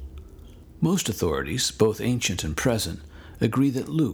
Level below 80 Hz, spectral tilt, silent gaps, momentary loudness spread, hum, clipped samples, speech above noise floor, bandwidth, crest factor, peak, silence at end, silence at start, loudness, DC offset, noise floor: -44 dBFS; -4.5 dB/octave; none; 14 LU; none; under 0.1%; 21 dB; over 20 kHz; 20 dB; -6 dBFS; 0 s; 0 s; -25 LUFS; under 0.1%; -45 dBFS